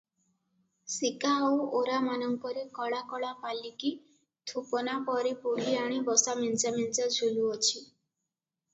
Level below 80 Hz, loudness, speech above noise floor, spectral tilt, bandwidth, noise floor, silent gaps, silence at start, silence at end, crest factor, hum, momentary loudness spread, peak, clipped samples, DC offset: -80 dBFS; -30 LUFS; 57 dB; -2 dB/octave; 8.2 kHz; -88 dBFS; none; 0.85 s; 0.9 s; 22 dB; none; 11 LU; -10 dBFS; under 0.1%; under 0.1%